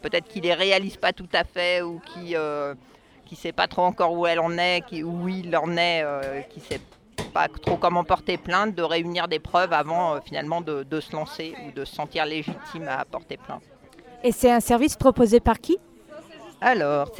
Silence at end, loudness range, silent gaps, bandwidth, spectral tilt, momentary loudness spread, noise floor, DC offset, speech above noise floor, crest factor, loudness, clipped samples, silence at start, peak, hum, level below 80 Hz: 0 s; 7 LU; none; 18.5 kHz; -4.5 dB/octave; 15 LU; -48 dBFS; under 0.1%; 24 dB; 20 dB; -24 LUFS; under 0.1%; 0.05 s; -4 dBFS; none; -46 dBFS